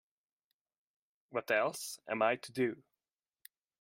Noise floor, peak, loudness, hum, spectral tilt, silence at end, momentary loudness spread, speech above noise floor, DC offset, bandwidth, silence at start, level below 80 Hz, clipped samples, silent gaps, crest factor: under -90 dBFS; -16 dBFS; -35 LUFS; none; -4 dB/octave; 1.05 s; 10 LU; over 55 dB; under 0.1%; 16 kHz; 1.3 s; -86 dBFS; under 0.1%; none; 22 dB